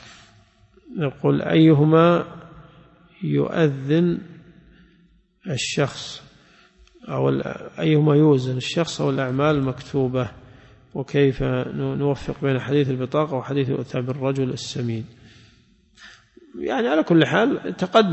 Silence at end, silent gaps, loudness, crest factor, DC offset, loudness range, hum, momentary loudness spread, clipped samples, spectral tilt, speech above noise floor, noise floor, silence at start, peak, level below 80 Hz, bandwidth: 0 s; none; -21 LUFS; 20 dB; under 0.1%; 8 LU; none; 15 LU; under 0.1%; -6.5 dB/octave; 37 dB; -58 dBFS; 0.05 s; -2 dBFS; -52 dBFS; 8.4 kHz